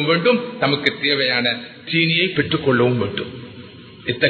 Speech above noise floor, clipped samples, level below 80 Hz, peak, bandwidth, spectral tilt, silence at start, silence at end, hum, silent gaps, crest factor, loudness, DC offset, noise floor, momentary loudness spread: 20 dB; under 0.1%; -52 dBFS; 0 dBFS; 8 kHz; -7.5 dB/octave; 0 s; 0 s; none; none; 20 dB; -18 LUFS; under 0.1%; -39 dBFS; 14 LU